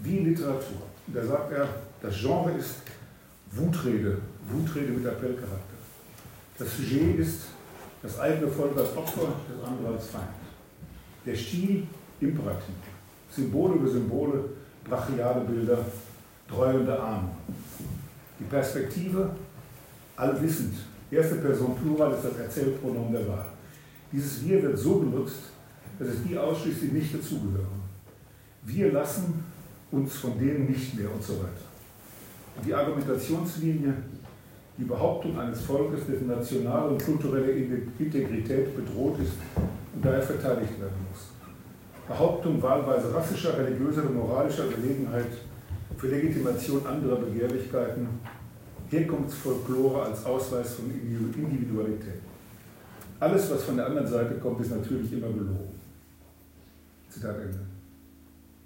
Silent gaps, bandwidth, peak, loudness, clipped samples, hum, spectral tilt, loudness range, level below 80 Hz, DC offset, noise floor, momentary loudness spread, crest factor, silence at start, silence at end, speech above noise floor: none; 16.5 kHz; -10 dBFS; -29 LUFS; under 0.1%; none; -7 dB/octave; 4 LU; -54 dBFS; under 0.1%; -54 dBFS; 20 LU; 20 dB; 0 s; 0.45 s; 26 dB